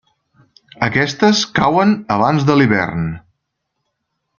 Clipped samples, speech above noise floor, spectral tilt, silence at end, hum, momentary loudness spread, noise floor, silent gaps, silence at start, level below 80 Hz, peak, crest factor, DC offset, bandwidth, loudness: under 0.1%; 59 dB; -5.5 dB/octave; 1.2 s; none; 9 LU; -74 dBFS; none; 0.8 s; -48 dBFS; 0 dBFS; 16 dB; under 0.1%; 7.2 kHz; -15 LUFS